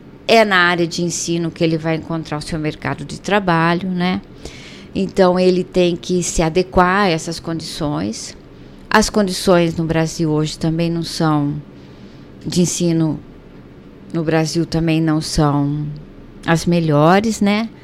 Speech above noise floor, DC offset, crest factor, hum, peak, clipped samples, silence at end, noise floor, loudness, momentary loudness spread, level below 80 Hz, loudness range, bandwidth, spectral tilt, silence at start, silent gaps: 23 dB; under 0.1%; 18 dB; none; 0 dBFS; under 0.1%; 0.05 s; -39 dBFS; -17 LUFS; 12 LU; -38 dBFS; 4 LU; 15 kHz; -5 dB/octave; 0 s; none